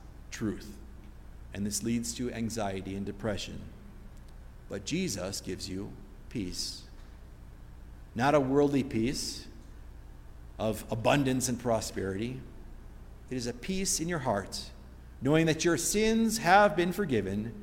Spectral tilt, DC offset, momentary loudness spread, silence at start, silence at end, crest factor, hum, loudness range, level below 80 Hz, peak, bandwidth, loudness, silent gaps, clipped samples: -4.5 dB/octave; under 0.1%; 25 LU; 0 s; 0 s; 24 dB; none; 10 LU; -48 dBFS; -8 dBFS; 16.5 kHz; -30 LUFS; none; under 0.1%